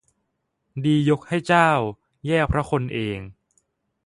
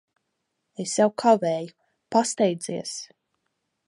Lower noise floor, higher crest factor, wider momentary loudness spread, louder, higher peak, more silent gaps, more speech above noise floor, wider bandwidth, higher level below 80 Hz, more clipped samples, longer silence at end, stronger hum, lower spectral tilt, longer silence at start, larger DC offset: about the same, -75 dBFS vs -78 dBFS; about the same, 20 dB vs 20 dB; second, 14 LU vs 18 LU; about the same, -22 LUFS vs -24 LUFS; first, -2 dBFS vs -6 dBFS; neither; about the same, 54 dB vs 55 dB; about the same, 11.5 kHz vs 11.5 kHz; first, -42 dBFS vs -76 dBFS; neither; about the same, 0.75 s vs 0.8 s; neither; first, -6.5 dB/octave vs -4.5 dB/octave; about the same, 0.75 s vs 0.8 s; neither